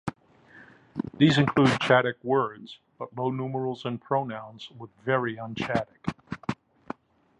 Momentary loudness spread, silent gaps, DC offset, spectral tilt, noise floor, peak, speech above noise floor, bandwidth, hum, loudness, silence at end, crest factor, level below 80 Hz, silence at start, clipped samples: 21 LU; none; under 0.1%; -6.5 dB/octave; -55 dBFS; -6 dBFS; 29 dB; 11 kHz; none; -27 LUFS; 0.85 s; 22 dB; -60 dBFS; 0.05 s; under 0.1%